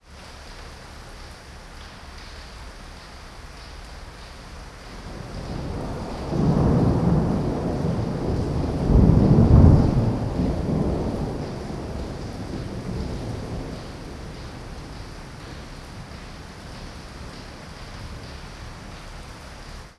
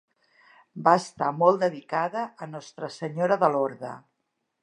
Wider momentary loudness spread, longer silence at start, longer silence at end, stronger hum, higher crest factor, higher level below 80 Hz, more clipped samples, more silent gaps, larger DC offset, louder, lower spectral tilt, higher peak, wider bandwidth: first, 22 LU vs 17 LU; second, 0.1 s vs 0.75 s; second, 0.05 s vs 0.65 s; neither; about the same, 24 dB vs 22 dB; first, -32 dBFS vs -78 dBFS; neither; neither; neither; first, -22 LUFS vs -25 LUFS; first, -8 dB/octave vs -6 dB/octave; first, 0 dBFS vs -6 dBFS; about the same, 12 kHz vs 11 kHz